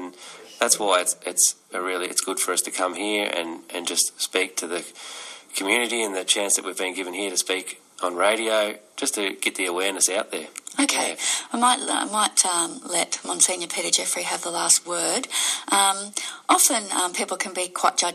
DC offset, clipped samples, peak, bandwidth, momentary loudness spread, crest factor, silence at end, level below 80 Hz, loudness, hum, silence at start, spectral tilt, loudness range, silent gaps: under 0.1%; under 0.1%; -2 dBFS; 15 kHz; 11 LU; 22 dB; 0 s; -86 dBFS; -22 LUFS; none; 0 s; 0 dB/octave; 4 LU; none